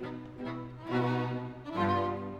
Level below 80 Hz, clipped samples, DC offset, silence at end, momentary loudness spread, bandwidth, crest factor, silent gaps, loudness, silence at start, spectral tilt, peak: -62 dBFS; under 0.1%; under 0.1%; 0 s; 11 LU; 8.8 kHz; 16 dB; none; -34 LUFS; 0 s; -8 dB/octave; -18 dBFS